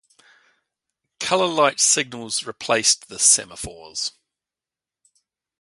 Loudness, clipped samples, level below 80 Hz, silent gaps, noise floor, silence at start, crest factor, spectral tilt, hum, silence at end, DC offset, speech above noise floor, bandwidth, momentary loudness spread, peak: -19 LUFS; under 0.1%; -58 dBFS; none; -90 dBFS; 1.2 s; 22 dB; -0.5 dB/octave; none; 1.5 s; under 0.1%; 69 dB; 12 kHz; 14 LU; -2 dBFS